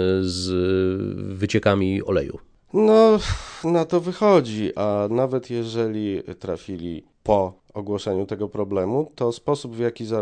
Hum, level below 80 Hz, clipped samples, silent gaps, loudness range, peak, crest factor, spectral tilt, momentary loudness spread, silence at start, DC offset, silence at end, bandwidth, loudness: none; -46 dBFS; under 0.1%; none; 6 LU; -4 dBFS; 18 dB; -6.5 dB/octave; 13 LU; 0 s; under 0.1%; 0 s; 10 kHz; -22 LUFS